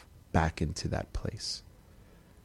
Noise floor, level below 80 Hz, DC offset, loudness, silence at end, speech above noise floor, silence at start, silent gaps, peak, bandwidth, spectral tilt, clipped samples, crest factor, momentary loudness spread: -56 dBFS; -44 dBFS; under 0.1%; -34 LUFS; 0.05 s; 24 dB; 0 s; none; -10 dBFS; 13 kHz; -5 dB/octave; under 0.1%; 26 dB; 8 LU